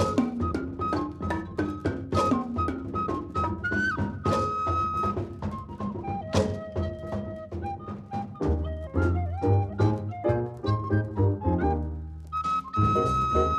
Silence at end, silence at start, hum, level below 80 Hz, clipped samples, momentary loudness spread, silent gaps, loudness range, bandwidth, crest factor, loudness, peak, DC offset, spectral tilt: 0 s; 0 s; none; -42 dBFS; under 0.1%; 10 LU; none; 4 LU; 11 kHz; 18 dB; -28 LUFS; -10 dBFS; under 0.1%; -7.5 dB/octave